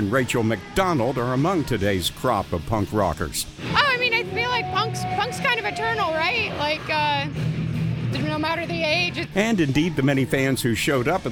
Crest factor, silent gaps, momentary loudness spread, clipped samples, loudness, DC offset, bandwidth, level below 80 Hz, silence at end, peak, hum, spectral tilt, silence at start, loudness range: 18 dB; none; 5 LU; under 0.1%; -22 LUFS; under 0.1%; over 20 kHz; -44 dBFS; 0 s; -4 dBFS; none; -5 dB/octave; 0 s; 2 LU